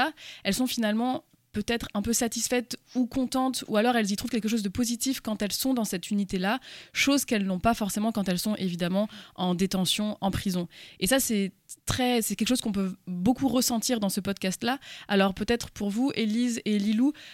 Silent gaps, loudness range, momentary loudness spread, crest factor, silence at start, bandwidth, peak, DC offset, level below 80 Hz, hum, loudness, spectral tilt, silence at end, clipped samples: none; 1 LU; 7 LU; 16 dB; 0 s; 17 kHz; -10 dBFS; under 0.1%; -52 dBFS; none; -27 LUFS; -4 dB/octave; 0 s; under 0.1%